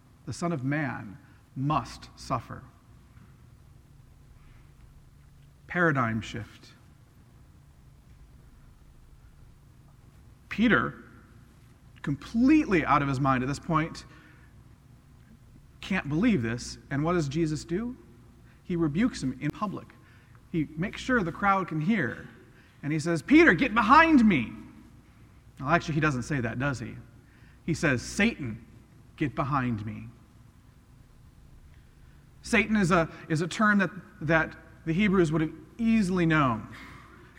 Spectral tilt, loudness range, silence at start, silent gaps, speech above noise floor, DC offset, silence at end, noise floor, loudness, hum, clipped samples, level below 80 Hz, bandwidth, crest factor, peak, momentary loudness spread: -6 dB/octave; 12 LU; 0.25 s; none; 29 dB; under 0.1%; 0.3 s; -55 dBFS; -27 LUFS; none; under 0.1%; -52 dBFS; 12 kHz; 24 dB; -4 dBFS; 19 LU